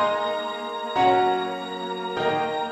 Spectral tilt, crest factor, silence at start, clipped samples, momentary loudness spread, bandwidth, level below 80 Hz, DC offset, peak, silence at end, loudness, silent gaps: -5 dB/octave; 16 dB; 0 s; under 0.1%; 10 LU; 12 kHz; -64 dBFS; under 0.1%; -8 dBFS; 0 s; -24 LUFS; none